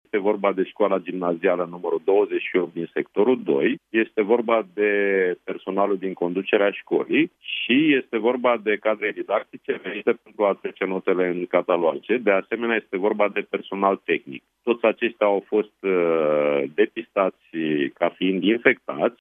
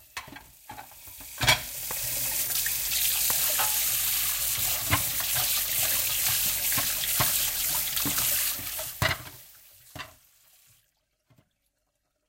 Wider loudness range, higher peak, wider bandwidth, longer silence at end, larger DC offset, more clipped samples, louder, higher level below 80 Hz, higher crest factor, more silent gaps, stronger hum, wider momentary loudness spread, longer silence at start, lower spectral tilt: second, 2 LU vs 7 LU; first, -2 dBFS vs -8 dBFS; second, 3.8 kHz vs 16.5 kHz; second, 0.1 s vs 2.2 s; neither; neither; about the same, -23 LUFS vs -24 LUFS; second, -78 dBFS vs -52 dBFS; about the same, 20 dB vs 22 dB; neither; neither; second, 6 LU vs 20 LU; about the same, 0.15 s vs 0.15 s; first, -8.5 dB/octave vs -0.5 dB/octave